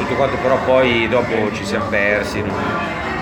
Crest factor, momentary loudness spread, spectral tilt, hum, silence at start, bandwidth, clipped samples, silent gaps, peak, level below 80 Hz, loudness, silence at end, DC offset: 16 dB; 7 LU; -5.5 dB/octave; none; 0 s; 19 kHz; under 0.1%; none; -2 dBFS; -40 dBFS; -17 LUFS; 0 s; under 0.1%